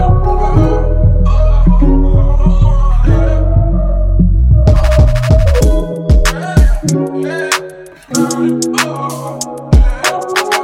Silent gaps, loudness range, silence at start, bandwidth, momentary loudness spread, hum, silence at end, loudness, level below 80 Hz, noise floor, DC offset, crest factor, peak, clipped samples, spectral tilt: none; 4 LU; 0 s; 15 kHz; 7 LU; none; 0 s; -12 LUFS; -12 dBFS; -30 dBFS; under 0.1%; 10 dB; 0 dBFS; under 0.1%; -6 dB/octave